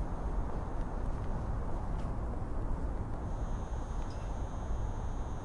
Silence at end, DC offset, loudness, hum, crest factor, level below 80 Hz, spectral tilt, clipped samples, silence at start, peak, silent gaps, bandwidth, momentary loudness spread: 0 s; under 0.1%; -40 LUFS; none; 12 dB; -36 dBFS; -7.5 dB/octave; under 0.1%; 0 s; -24 dBFS; none; 10.5 kHz; 2 LU